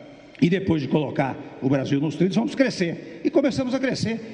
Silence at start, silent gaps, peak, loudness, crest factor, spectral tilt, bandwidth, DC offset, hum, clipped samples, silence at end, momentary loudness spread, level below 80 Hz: 0 s; none; -6 dBFS; -23 LUFS; 16 dB; -6.5 dB/octave; 10 kHz; under 0.1%; none; under 0.1%; 0 s; 6 LU; -56 dBFS